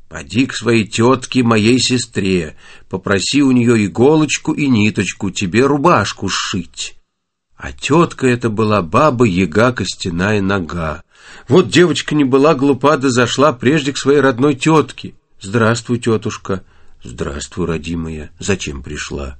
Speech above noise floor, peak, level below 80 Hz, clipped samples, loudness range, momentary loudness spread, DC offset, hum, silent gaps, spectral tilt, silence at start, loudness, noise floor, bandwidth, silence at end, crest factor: 52 dB; 0 dBFS; -40 dBFS; under 0.1%; 5 LU; 13 LU; under 0.1%; none; none; -5 dB/octave; 0.05 s; -15 LUFS; -67 dBFS; 8.8 kHz; 0.05 s; 14 dB